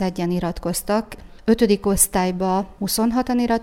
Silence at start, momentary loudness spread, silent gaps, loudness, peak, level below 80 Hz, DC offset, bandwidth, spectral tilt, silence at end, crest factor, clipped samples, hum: 0 s; 7 LU; none; -20 LUFS; -2 dBFS; -40 dBFS; under 0.1%; 17.5 kHz; -4.5 dB/octave; 0 s; 18 dB; under 0.1%; none